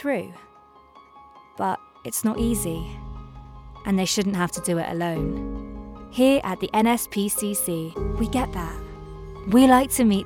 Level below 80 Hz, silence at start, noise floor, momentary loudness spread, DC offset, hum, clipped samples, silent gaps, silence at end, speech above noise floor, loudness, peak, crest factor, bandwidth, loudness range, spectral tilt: -40 dBFS; 0 s; -51 dBFS; 21 LU; under 0.1%; none; under 0.1%; none; 0 s; 29 dB; -23 LUFS; -4 dBFS; 20 dB; 19 kHz; 7 LU; -4.5 dB/octave